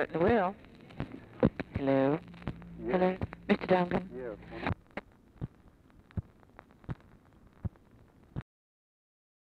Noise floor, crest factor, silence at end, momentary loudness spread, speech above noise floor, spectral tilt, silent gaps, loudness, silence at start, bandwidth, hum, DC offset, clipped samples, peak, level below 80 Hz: -60 dBFS; 22 dB; 1.1 s; 18 LU; 29 dB; -9 dB/octave; none; -33 LUFS; 0 s; 6 kHz; none; under 0.1%; under 0.1%; -12 dBFS; -54 dBFS